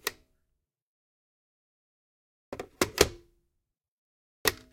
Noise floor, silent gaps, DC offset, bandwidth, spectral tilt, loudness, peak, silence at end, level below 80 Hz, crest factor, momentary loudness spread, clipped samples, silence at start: -83 dBFS; 0.82-2.52 s, 3.88-4.45 s; under 0.1%; 16.5 kHz; -2.5 dB/octave; -29 LUFS; -2 dBFS; 0.2 s; -52 dBFS; 34 dB; 18 LU; under 0.1%; 0.05 s